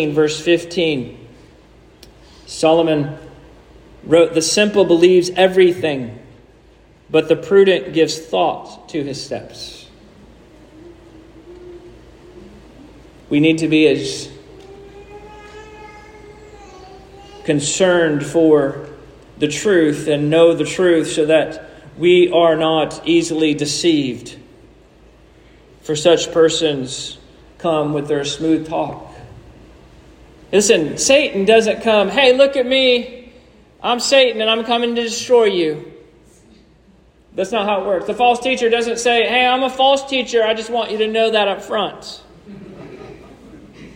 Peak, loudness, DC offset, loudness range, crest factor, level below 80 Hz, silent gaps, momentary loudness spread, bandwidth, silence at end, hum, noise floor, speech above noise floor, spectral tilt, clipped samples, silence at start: 0 dBFS; -15 LUFS; under 0.1%; 7 LU; 16 dB; -50 dBFS; none; 19 LU; 16 kHz; 0.05 s; none; -50 dBFS; 35 dB; -4 dB/octave; under 0.1%; 0 s